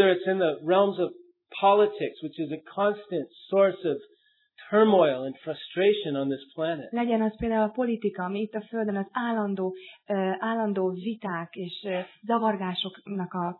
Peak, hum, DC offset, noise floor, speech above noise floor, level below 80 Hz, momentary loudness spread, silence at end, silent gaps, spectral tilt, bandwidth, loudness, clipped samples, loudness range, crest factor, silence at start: -8 dBFS; none; under 0.1%; -56 dBFS; 30 dB; -60 dBFS; 11 LU; 0.05 s; none; -9.5 dB/octave; 4.3 kHz; -27 LUFS; under 0.1%; 4 LU; 18 dB; 0 s